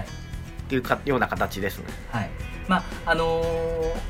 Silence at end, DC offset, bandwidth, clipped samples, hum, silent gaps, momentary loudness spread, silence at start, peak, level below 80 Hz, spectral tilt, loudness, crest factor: 0 s; under 0.1%; 16 kHz; under 0.1%; none; none; 13 LU; 0 s; -6 dBFS; -36 dBFS; -5.5 dB/octave; -26 LUFS; 20 dB